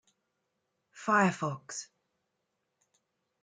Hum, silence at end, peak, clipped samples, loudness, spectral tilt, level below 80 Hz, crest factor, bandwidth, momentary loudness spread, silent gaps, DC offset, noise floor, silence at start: none; 1.6 s; -14 dBFS; under 0.1%; -30 LUFS; -5 dB/octave; -80 dBFS; 22 dB; 9.6 kHz; 16 LU; none; under 0.1%; -82 dBFS; 0.95 s